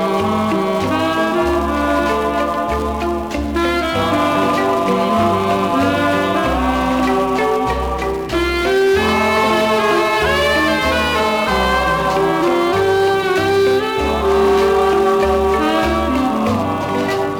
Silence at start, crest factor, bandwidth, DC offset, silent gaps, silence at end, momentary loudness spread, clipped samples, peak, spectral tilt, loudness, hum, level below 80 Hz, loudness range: 0 s; 10 dB; 18.5 kHz; under 0.1%; none; 0 s; 4 LU; under 0.1%; -4 dBFS; -5 dB/octave; -16 LUFS; none; -32 dBFS; 3 LU